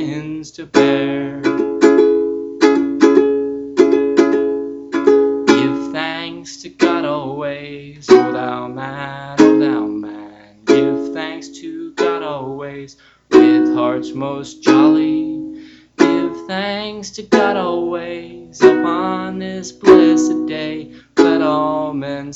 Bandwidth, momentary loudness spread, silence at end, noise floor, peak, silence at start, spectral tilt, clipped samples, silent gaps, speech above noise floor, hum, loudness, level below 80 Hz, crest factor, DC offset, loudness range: 8 kHz; 17 LU; 0 s; -37 dBFS; 0 dBFS; 0 s; -5.5 dB/octave; under 0.1%; none; 21 dB; none; -15 LUFS; -54 dBFS; 16 dB; under 0.1%; 4 LU